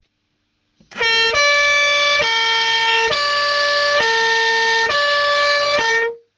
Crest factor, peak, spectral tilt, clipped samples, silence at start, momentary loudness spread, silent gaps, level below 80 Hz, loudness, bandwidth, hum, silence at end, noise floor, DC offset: 12 dB; -4 dBFS; 0.5 dB/octave; under 0.1%; 0.9 s; 3 LU; none; -54 dBFS; -14 LUFS; 10 kHz; none; 0.2 s; -69 dBFS; under 0.1%